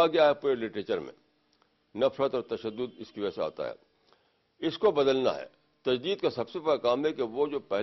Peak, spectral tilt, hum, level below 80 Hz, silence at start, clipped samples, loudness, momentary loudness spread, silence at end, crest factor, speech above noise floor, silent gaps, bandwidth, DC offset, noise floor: -12 dBFS; -6 dB/octave; none; -68 dBFS; 0 s; under 0.1%; -30 LUFS; 13 LU; 0 s; 18 dB; 41 dB; none; 6.2 kHz; under 0.1%; -70 dBFS